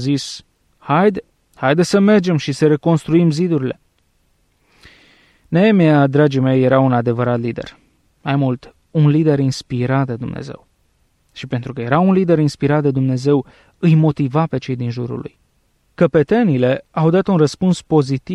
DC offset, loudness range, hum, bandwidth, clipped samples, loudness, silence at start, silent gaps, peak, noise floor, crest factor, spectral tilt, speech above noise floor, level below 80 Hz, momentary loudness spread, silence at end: under 0.1%; 3 LU; none; 11 kHz; under 0.1%; -16 LUFS; 0 s; none; -2 dBFS; -61 dBFS; 14 dB; -7.5 dB/octave; 46 dB; -52 dBFS; 13 LU; 0 s